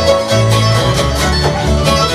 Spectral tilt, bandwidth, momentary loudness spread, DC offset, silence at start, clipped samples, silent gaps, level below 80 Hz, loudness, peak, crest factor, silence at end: -4.5 dB/octave; 15 kHz; 2 LU; under 0.1%; 0 s; under 0.1%; none; -22 dBFS; -12 LUFS; 0 dBFS; 12 dB; 0 s